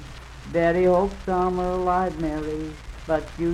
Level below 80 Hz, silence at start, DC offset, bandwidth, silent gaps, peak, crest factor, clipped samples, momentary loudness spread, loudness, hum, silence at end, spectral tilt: -38 dBFS; 0 s; under 0.1%; 11.5 kHz; none; -10 dBFS; 14 dB; under 0.1%; 16 LU; -24 LUFS; none; 0 s; -7.5 dB/octave